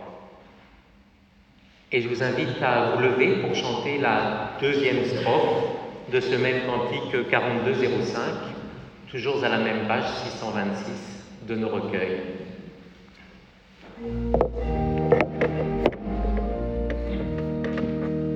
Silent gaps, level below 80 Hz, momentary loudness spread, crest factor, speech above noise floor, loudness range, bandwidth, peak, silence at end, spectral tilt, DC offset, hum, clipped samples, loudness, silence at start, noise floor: none; -38 dBFS; 13 LU; 20 dB; 32 dB; 7 LU; 8.4 kHz; -6 dBFS; 0 s; -6.5 dB/octave; under 0.1%; none; under 0.1%; -25 LUFS; 0 s; -56 dBFS